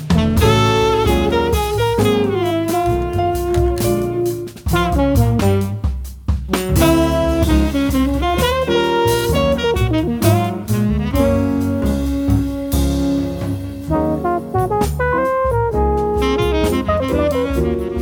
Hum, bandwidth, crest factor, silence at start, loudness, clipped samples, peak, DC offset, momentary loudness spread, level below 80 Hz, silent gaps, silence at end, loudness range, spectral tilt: none; over 20 kHz; 14 dB; 0 s; -17 LUFS; under 0.1%; -2 dBFS; under 0.1%; 5 LU; -24 dBFS; none; 0 s; 3 LU; -6 dB/octave